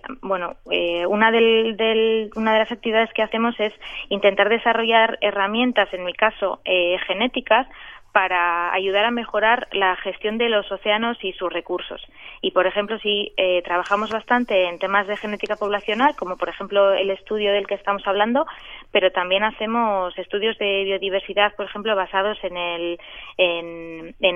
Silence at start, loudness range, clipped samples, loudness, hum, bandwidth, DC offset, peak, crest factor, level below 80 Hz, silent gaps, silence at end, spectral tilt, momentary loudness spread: 0.05 s; 3 LU; under 0.1%; -21 LUFS; none; 7.6 kHz; under 0.1%; -2 dBFS; 18 dB; -52 dBFS; none; 0 s; -5.5 dB/octave; 9 LU